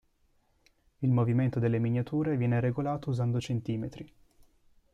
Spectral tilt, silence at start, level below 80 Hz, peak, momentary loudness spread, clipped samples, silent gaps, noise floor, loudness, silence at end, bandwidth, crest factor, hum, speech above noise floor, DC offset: -8.5 dB/octave; 1 s; -60 dBFS; -16 dBFS; 9 LU; under 0.1%; none; -69 dBFS; -30 LUFS; 0.9 s; 7.8 kHz; 14 dB; none; 41 dB; under 0.1%